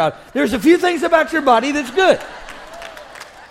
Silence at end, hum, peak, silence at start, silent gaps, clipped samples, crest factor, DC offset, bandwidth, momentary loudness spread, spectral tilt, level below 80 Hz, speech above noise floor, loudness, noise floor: 0.05 s; none; 0 dBFS; 0 s; none; under 0.1%; 16 dB; under 0.1%; 16 kHz; 21 LU; -4 dB/octave; -48 dBFS; 22 dB; -15 LUFS; -37 dBFS